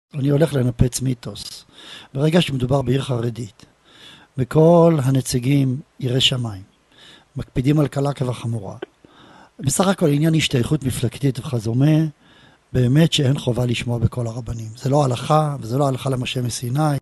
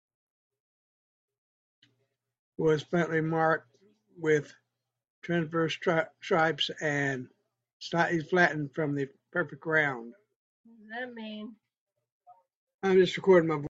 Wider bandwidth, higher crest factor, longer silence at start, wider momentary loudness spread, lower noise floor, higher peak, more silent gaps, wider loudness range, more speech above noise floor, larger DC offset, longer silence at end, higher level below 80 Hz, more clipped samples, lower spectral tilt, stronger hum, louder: first, 12.5 kHz vs 7.8 kHz; about the same, 20 dB vs 22 dB; second, 0.15 s vs 2.6 s; about the same, 15 LU vs 17 LU; second, -51 dBFS vs -85 dBFS; first, 0 dBFS vs -8 dBFS; second, none vs 5.10-5.22 s, 7.73-7.80 s, 10.36-10.64 s, 11.80-11.87 s, 12.12-12.20 s, 12.55-12.67 s, 12.74-12.79 s; about the same, 4 LU vs 5 LU; second, 32 dB vs 57 dB; neither; about the same, 0 s vs 0 s; first, -44 dBFS vs -72 dBFS; neither; about the same, -6 dB/octave vs -6 dB/octave; neither; first, -19 LUFS vs -28 LUFS